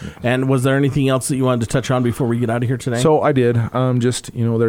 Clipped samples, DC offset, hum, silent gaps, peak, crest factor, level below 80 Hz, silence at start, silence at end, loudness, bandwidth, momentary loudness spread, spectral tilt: under 0.1%; under 0.1%; none; none; -2 dBFS; 16 dB; -44 dBFS; 0 s; 0 s; -17 LUFS; 16 kHz; 5 LU; -6.5 dB/octave